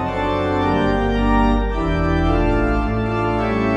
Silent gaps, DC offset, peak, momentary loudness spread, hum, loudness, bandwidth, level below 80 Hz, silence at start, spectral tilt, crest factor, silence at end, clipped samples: none; under 0.1%; -4 dBFS; 3 LU; none; -19 LUFS; 8.2 kHz; -24 dBFS; 0 s; -8 dB/octave; 14 dB; 0 s; under 0.1%